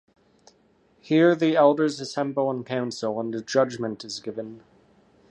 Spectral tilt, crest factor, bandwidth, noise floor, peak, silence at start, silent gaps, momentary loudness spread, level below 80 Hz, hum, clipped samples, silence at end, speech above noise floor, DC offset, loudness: -5.5 dB/octave; 20 dB; 9.6 kHz; -62 dBFS; -6 dBFS; 1.05 s; none; 14 LU; -72 dBFS; none; under 0.1%; 0.75 s; 38 dB; under 0.1%; -24 LUFS